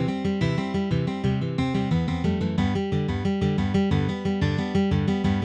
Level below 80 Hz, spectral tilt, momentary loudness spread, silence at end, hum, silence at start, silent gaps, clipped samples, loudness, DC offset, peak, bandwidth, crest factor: -40 dBFS; -7.5 dB/octave; 3 LU; 0 s; none; 0 s; none; under 0.1%; -25 LUFS; under 0.1%; -10 dBFS; 8.6 kHz; 14 dB